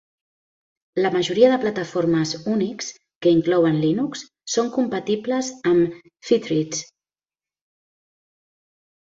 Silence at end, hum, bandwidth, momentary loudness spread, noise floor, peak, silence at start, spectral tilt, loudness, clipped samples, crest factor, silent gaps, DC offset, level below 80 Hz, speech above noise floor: 2.2 s; none; 7.8 kHz; 11 LU; under -90 dBFS; -4 dBFS; 0.95 s; -5 dB/octave; -21 LUFS; under 0.1%; 20 dB; 3.16-3.21 s; under 0.1%; -62 dBFS; over 70 dB